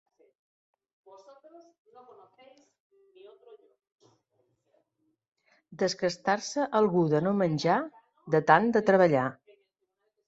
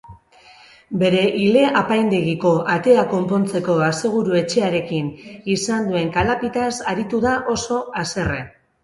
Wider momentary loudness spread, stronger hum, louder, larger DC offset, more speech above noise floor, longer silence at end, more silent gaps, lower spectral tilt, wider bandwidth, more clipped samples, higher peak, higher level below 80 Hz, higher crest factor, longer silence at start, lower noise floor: about the same, 8 LU vs 9 LU; neither; second, -26 LUFS vs -19 LUFS; neither; first, 52 dB vs 29 dB; first, 0.95 s vs 0.35 s; neither; about the same, -6 dB/octave vs -5.5 dB/octave; second, 8 kHz vs 11.5 kHz; neither; second, -6 dBFS vs -2 dBFS; second, -74 dBFS vs -46 dBFS; first, 24 dB vs 18 dB; first, 5.7 s vs 0.05 s; first, -79 dBFS vs -48 dBFS